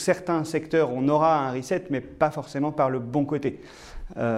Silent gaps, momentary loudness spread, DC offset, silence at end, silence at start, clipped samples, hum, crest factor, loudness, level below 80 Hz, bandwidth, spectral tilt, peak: none; 11 LU; under 0.1%; 0 s; 0 s; under 0.1%; none; 18 dB; -25 LUFS; -48 dBFS; 14 kHz; -6.5 dB/octave; -6 dBFS